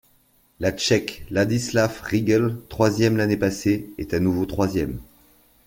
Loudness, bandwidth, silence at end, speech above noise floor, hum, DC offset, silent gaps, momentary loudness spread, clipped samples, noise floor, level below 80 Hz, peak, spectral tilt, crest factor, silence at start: -22 LUFS; 17 kHz; 0.65 s; 39 dB; none; under 0.1%; none; 7 LU; under 0.1%; -60 dBFS; -46 dBFS; -4 dBFS; -5.5 dB/octave; 18 dB; 0.6 s